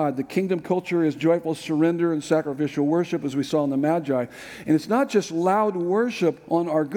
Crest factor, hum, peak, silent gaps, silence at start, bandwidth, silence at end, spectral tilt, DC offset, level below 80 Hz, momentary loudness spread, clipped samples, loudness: 14 dB; none; -8 dBFS; none; 0 s; 16.5 kHz; 0 s; -6.5 dB/octave; under 0.1%; -66 dBFS; 5 LU; under 0.1%; -23 LUFS